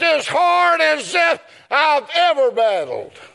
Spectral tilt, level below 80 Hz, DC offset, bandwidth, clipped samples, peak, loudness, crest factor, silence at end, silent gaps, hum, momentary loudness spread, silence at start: -1.5 dB/octave; -76 dBFS; under 0.1%; 11.5 kHz; under 0.1%; -2 dBFS; -16 LUFS; 16 dB; 0.1 s; none; none; 9 LU; 0 s